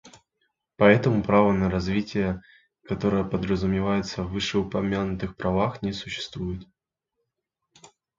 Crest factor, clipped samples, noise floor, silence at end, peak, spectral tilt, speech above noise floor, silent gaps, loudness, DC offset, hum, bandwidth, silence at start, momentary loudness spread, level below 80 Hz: 24 dB; under 0.1%; -82 dBFS; 1.55 s; -2 dBFS; -6.5 dB/octave; 58 dB; none; -25 LUFS; under 0.1%; none; 7.6 kHz; 0.05 s; 12 LU; -46 dBFS